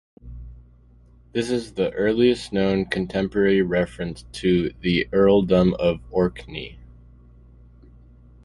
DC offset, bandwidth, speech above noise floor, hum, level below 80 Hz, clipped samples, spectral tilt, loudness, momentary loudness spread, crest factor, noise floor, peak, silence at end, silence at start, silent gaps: under 0.1%; 11.5 kHz; 30 dB; 60 Hz at -45 dBFS; -44 dBFS; under 0.1%; -7 dB/octave; -22 LUFS; 17 LU; 18 dB; -51 dBFS; -4 dBFS; 1.6 s; 0.25 s; none